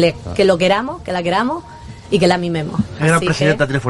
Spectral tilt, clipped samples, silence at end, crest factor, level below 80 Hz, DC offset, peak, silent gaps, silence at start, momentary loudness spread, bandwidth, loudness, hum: -5.5 dB/octave; under 0.1%; 0 s; 16 dB; -44 dBFS; under 0.1%; 0 dBFS; none; 0 s; 8 LU; 11.5 kHz; -16 LUFS; none